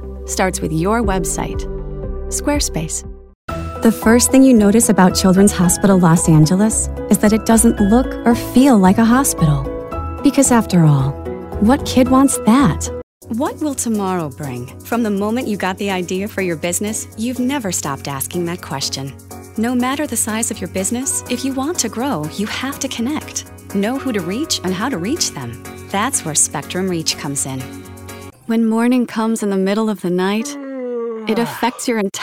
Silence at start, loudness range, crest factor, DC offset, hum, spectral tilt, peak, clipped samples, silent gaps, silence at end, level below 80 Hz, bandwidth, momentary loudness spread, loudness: 0 s; 8 LU; 16 dB; under 0.1%; none; -5 dB/octave; -2 dBFS; under 0.1%; 3.35-3.48 s, 13.03-13.21 s; 0 s; -34 dBFS; 16.5 kHz; 14 LU; -16 LUFS